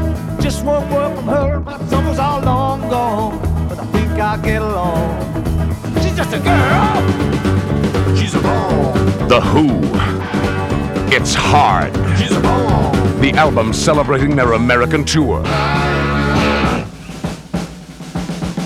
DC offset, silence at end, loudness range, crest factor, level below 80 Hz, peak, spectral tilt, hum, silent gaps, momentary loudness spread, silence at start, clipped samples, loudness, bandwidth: under 0.1%; 0 s; 4 LU; 14 dB; -26 dBFS; 0 dBFS; -6 dB/octave; none; none; 8 LU; 0 s; under 0.1%; -15 LUFS; 15.5 kHz